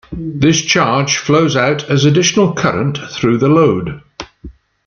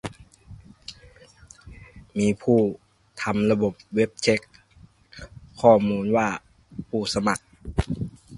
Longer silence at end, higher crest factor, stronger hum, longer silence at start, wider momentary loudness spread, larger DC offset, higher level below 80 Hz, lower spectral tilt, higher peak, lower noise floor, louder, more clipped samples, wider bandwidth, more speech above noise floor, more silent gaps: first, 0.35 s vs 0 s; second, 12 dB vs 22 dB; neither; about the same, 0.1 s vs 0.05 s; second, 15 LU vs 22 LU; neither; about the same, -42 dBFS vs -44 dBFS; second, -4.5 dB/octave vs -6 dB/octave; about the same, 0 dBFS vs -2 dBFS; second, -36 dBFS vs -54 dBFS; first, -13 LUFS vs -24 LUFS; neither; second, 7.2 kHz vs 11.5 kHz; second, 23 dB vs 32 dB; neither